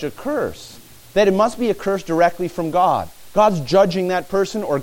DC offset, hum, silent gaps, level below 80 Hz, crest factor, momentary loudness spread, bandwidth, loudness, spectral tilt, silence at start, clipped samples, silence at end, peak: under 0.1%; none; none; -48 dBFS; 16 dB; 8 LU; 17 kHz; -19 LUFS; -5.5 dB/octave; 0 s; under 0.1%; 0 s; -2 dBFS